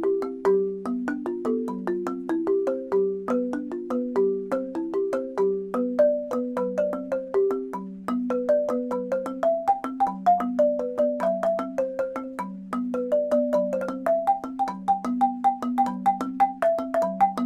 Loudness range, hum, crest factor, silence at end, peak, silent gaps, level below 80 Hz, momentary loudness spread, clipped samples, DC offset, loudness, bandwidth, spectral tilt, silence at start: 2 LU; none; 16 dB; 0 s; -10 dBFS; none; -64 dBFS; 7 LU; under 0.1%; under 0.1%; -26 LUFS; 14.5 kHz; -7.5 dB/octave; 0 s